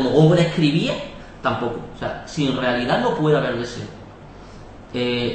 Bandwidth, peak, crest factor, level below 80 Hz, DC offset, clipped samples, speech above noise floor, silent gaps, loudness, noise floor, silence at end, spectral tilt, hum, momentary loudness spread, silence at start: 8.6 kHz; -4 dBFS; 18 dB; -46 dBFS; 0.1%; under 0.1%; 20 dB; none; -21 LUFS; -40 dBFS; 0 s; -6.5 dB/octave; none; 25 LU; 0 s